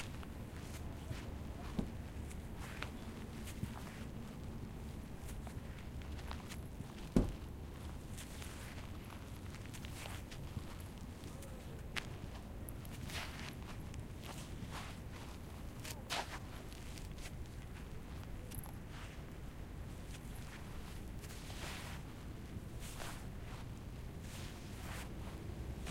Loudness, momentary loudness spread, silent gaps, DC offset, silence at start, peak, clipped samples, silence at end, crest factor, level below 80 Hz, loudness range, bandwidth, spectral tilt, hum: -48 LUFS; 6 LU; none; under 0.1%; 0 s; -16 dBFS; under 0.1%; 0 s; 30 dB; -50 dBFS; 5 LU; 16.5 kHz; -5 dB/octave; none